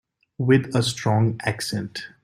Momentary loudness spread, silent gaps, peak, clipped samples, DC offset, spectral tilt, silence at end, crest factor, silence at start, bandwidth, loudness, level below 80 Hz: 9 LU; none; -6 dBFS; under 0.1%; under 0.1%; -5.5 dB/octave; 0.15 s; 18 dB; 0.4 s; 15.5 kHz; -22 LUFS; -56 dBFS